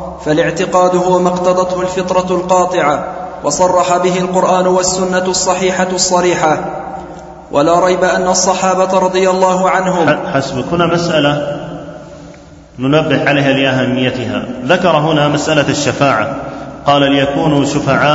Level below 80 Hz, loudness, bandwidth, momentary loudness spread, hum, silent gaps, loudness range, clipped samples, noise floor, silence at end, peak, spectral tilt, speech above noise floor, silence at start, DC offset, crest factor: -42 dBFS; -12 LUFS; 8 kHz; 9 LU; none; none; 3 LU; under 0.1%; -36 dBFS; 0 s; 0 dBFS; -4.5 dB/octave; 24 dB; 0 s; under 0.1%; 12 dB